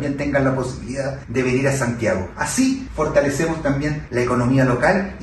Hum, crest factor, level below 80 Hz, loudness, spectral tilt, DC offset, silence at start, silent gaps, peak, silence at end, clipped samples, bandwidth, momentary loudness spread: none; 16 dB; -38 dBFS; -20 LUFS; -6 dB/octave; under 0.1%; 0 s; none; -4 dBFS; 0 s; under 0.1%; 12.5 kHz; 7 LU